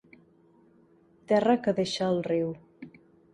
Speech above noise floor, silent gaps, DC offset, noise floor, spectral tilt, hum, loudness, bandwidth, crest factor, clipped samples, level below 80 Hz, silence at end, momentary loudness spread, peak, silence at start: 35 dB; none; under 0.1%; -61 dBFS; -6 dB/octave; none; -27 LUFS; 11.5 kHz; 20 dB; under 0.1%; -68 dBFS; 0.45 s; 25 LU; -10 dBFS; 1.3 s